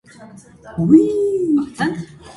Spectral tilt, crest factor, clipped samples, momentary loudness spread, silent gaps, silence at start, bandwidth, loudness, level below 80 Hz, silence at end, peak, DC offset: -7.5 dB/octave; 18 dB; under 0.1%; 14 LU; none; 0.2 s; 11.5 kHz; -16 LUFS; -52 dBFS; 0.05 s; 0 dBFS; under 0.1%